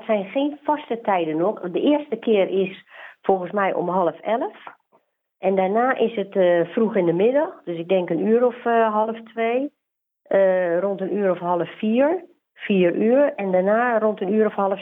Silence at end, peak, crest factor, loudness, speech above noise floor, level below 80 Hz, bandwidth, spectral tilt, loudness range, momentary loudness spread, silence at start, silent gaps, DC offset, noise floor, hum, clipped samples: 0 s; -4 dBFS; 18 dB; -21 LUFS; 49 dB; -74 dBFS; 3.9 kHz; -9.5 dB/octave; 3 LU; 7 LU; 0 s; none; under 0.1%; -69 dBFS; none; under 0.1%